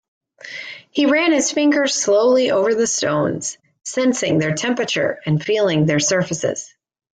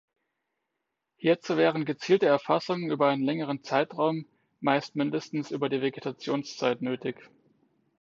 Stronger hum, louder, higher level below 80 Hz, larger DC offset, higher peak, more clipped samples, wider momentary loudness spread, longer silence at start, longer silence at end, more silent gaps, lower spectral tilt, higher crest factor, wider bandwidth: neither; first, -18 LUFS vs -28 LUFS; first, -60 dBFS vs -78 dBFS; neither; about the same, -6 dBFS vs -8 dBFS; neither; first, 14 LU vs 8 LU; second, 0.45 s vs 1.2 s; second, 0.5 s vs 0.75 s; neither; second, -4 dB/octave vs -6 dB/octave; second, 12 dB vs 20 dB; first, 9.6 kHz vs 7.6 kHz